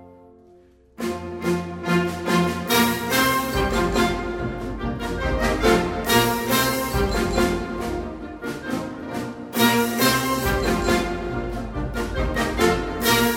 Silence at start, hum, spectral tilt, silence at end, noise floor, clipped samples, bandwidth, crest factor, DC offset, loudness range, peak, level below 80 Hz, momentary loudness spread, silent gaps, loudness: 0 s; none; -4 dB/octave; 0 s; -52 dBFS; under 0.1%; 16.5 kHz; 18 dB; under 0.1%; 2 LU; -4 dBFS; -34 dBFS; 10 LU; none; -22 LUFS